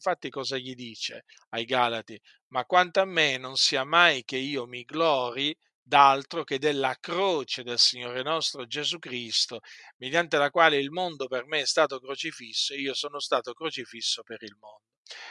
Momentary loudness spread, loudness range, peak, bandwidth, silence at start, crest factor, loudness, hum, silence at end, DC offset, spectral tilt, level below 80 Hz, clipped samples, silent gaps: 14 LU; 5 LU; -4 dBFS; 12 kHz; 0 s; 24 dB; -26 LUFS; none; 0 s; under 0.1%; -2 dB/octave; -80 dBFS; under 0.1%; 1.47-1.51 s, 2.41-2.51 s, 5.75-5.86 s, 9.94-10.00 s, 14.97-15.05 s